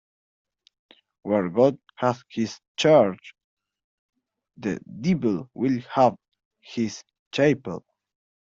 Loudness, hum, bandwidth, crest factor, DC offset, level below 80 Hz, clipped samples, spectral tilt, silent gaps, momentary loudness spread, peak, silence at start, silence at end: -24 LUFS; none; 7.8 kHz; 20 dB; under 0.1%; -66 dBFS; under 0.1%; -6 dB/octave; 2.68-2.75 s, 3.44-3.57 s, 3.84-4.09 s, 6.45-6.51 s, 7.19-7.31 s; 16 LU; -6 dBFS; 1.25 s; 0.6 s